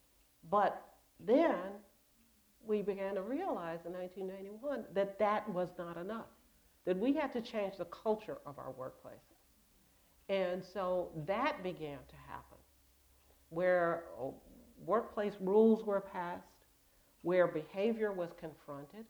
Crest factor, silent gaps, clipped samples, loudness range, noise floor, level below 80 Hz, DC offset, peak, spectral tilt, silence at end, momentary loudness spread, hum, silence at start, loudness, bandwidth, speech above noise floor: 20 dB; none; under 0.1%; 7 LU; -70 dBFS; -70 dBFS; under 0.1%; -18 dBFS; -7 dB/octave; 0.05 s; 18 LU; none; 0.45 s; -37 LUFS; over 20 kHz; 33 dB